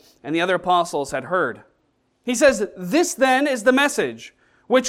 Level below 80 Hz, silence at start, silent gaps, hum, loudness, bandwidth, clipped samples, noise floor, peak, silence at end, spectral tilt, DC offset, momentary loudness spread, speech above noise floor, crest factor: -58 dBFS; 0.25 s; none; none; -20 LUFS; 16 kHz; under 0.1%; -66 dBFS; -4 dBFS; 0 s; -3.5 dB/octave; under 0.1%; 9 LU; 47 dB; 18 dB